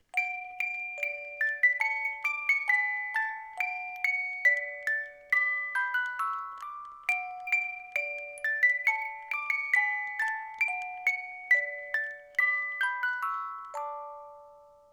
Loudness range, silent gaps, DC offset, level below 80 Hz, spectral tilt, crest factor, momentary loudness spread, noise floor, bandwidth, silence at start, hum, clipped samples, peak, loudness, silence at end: 2 LU; none; under 0.1%; -78 dBFS; 1 dB/octave; 18 dB; 10 LU; -55 dBFS; 18.5 kHz; 0.15 s; none; under 0.1%; -14 dBFS; -29 LUFS; 0.25 s